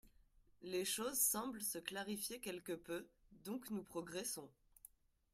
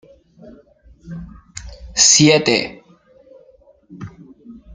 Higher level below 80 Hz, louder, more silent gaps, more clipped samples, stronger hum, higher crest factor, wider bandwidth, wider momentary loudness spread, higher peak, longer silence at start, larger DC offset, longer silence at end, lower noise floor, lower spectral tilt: second, -76 dBFS vs -46 dBFS; second, -43 LUFS vs -12 LUFS; neither; neither; neither; about the same, 22 dB vs 20 dB; first, 16 kHz vs 10.5 kHz; second, 24 LU vs 27 LU; second, -24 dBFS vs 0 dBFS; second, 0.05 s vs 1.05 s; neither; first, 0.85 s vs 0.25 s; first, -71 dBFS vs -50 dBFS; about the same, -2 dB/octave vs -2.5 dB/octave